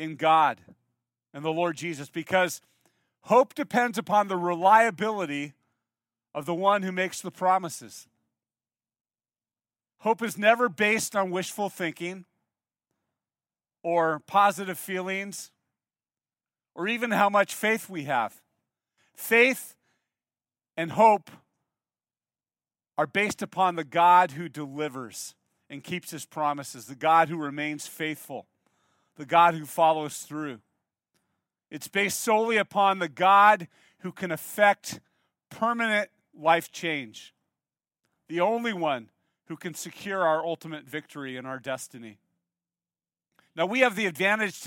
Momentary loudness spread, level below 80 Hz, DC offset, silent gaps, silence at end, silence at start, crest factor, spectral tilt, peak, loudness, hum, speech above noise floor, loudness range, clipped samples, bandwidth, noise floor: 18 LU; -78 dBFS; under 0.1%; none; 0 s; 0 s; 22 dB; -4 dB/octave; -4 dBFS; -25 LUFS; none; over 64 dB; 7 LU; under 0.1%; 17 kHz; under -90 dBFS